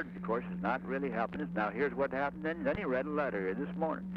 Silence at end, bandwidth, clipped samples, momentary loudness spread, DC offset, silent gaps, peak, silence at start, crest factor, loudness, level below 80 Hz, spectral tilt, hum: 0 s; 5.8 kHz; under 0.1%; 3 LU; under 0.1%; none; -20 dBFS; 0 s; 14 dB; -35 LUFS; -60 dBFS; -9 dB/octave; none